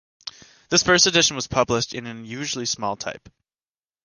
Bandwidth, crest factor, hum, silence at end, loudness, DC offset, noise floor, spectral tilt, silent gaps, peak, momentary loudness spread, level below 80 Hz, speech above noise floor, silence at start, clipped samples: 11 kHz; 22 dB; none; 0.9 s; -20 LUFS; under 0.1%; under -90 dBFS; -2 dB/octave; none; -2 dBFS; 22 LU; -52 dBFS; over 68 dB; 0.25 s; under 0.1%